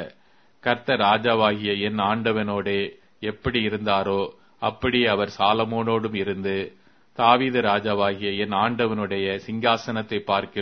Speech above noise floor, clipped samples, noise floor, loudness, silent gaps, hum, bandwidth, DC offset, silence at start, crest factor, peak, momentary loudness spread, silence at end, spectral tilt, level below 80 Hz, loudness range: 38 dB; under 0.1%; -61 dBFS; -23 LUFS; none; none; 6.6 kHz; 0.1%; 0 s; 22 dB; -2 dBFS; 10 LU; 0 s; -6.5 dB/octave; -54 dBFS; 2 LU